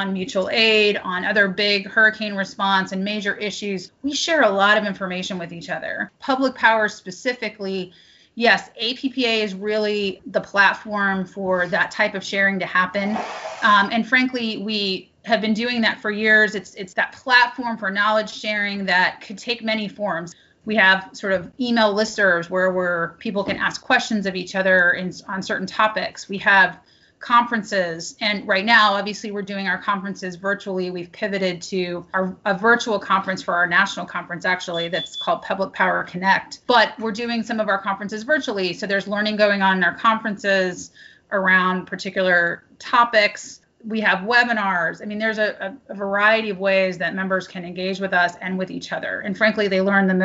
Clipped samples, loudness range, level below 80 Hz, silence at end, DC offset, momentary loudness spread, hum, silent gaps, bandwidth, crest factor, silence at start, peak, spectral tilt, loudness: under 0.1%; 3 LU; -62 dBFS; 0 s; under 0.1%; 11 LU; none; none; 8 kHz; 20 dB; 0 s; -2 dBFS; -2 dB/octave; -20 LUFS